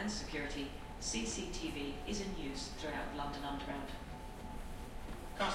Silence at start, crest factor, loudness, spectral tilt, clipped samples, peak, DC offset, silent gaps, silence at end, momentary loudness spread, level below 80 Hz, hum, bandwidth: 0 s; 18 dB; -42 LUFS; -3.5 dB/octave; under 0.1%; -24 dBFS; under 0.1%; none; 0 s; 10 LU; -48 dBFS; none; 16.5 kHz